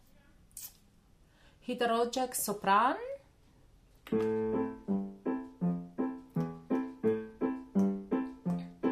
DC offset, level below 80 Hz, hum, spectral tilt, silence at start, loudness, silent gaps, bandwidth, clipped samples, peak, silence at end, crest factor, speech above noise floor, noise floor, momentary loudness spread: under 0.1%; -64 dBFS; none; -5.5 dB/octave; 0.55 s; -34 LUFS; none; 15.5 kHz; under 0.1%; -14 dBFS; 0 s; 20 dB; 33 dB; -63 dBFS; 15 LU